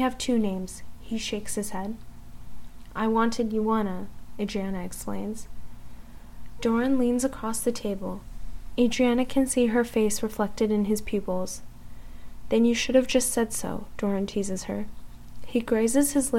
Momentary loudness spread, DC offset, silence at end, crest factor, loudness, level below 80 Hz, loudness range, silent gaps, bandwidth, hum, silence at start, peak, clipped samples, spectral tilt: 14 LU; 1%; 0 s; 18 dB; -27 LUFS; -44 dBFS; 5 LU; none; 16.5 kHz; 60 Hz at -50 dBFS; 0 s; -8 dBFS; under 0.1%; -4.5 dB/octave